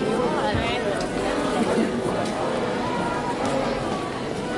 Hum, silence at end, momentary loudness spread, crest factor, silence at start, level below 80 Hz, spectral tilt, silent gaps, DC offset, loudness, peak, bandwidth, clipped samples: none; 0 s; 4 LU; 14 dB; 0 s; -44 dBFS; -5 dB/octave; none; under 0.1%; -24 LUFS; -10 dBFS; 11.5 kHz; under 0.1%